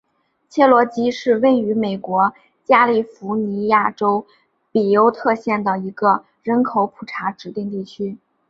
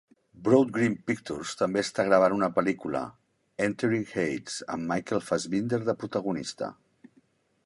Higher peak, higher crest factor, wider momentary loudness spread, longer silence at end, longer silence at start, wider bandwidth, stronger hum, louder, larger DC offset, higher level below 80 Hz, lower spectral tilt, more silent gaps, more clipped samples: first, -2 dBFS vs -6 dBFS; about the same, 18 dB vs 22 dB; about the same, 13 LU vs 12 LU; second, 0.35 s vs 0.95 s; first, 0.55 s vs 0.35 s; second, 7.6 kHz vs 11.5 kHz; neither; first, -18 LUFS vs -28 LUFS; neither; about the same, -64 dBFS vs -64 dBFS; first, -7 dB/octave vs -5.5 dB/octave; neither; neither